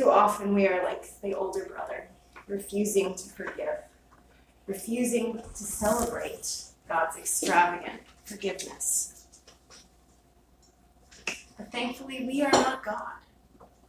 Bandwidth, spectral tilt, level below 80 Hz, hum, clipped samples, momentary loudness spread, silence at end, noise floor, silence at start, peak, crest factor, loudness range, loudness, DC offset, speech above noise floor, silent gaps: 16 kHz; -3 dB/octave; -58 dBFS; none; under 0.1%; 15 LU; 0.25 s; -61 dBFS; 0 s; -8 dBFS; 22 dB; 6 LU; -29 LUFS; under 0.1%; 32 dB; none